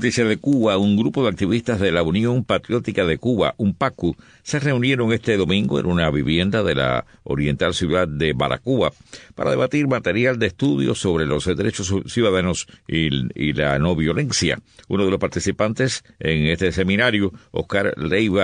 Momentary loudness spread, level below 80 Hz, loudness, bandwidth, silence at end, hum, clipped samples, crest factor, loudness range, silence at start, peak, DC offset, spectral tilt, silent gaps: 5 LU; -42 dBFS; -20 LUFS; 10 kHz; 0 s; none; under 0.1%; 16 dB; 1 LU; 0 s; -4 dBFS; under 0.1%; -5.5 dB/octave; none